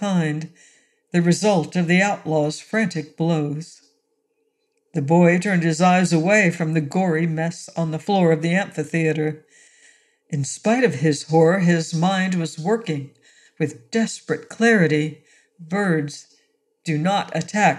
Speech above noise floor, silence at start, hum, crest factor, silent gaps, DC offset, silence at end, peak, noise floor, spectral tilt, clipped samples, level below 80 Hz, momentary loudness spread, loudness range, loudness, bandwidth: 50 dB; 0 s; none; 18 dB; none; under 0.1%; 0 s; -4 dBFS; -70 dBFS; -6 dB/octave; under 0.1%; -70 dBFS; 12 LU; 4 LU; -20 LUFS; 11.5 kHz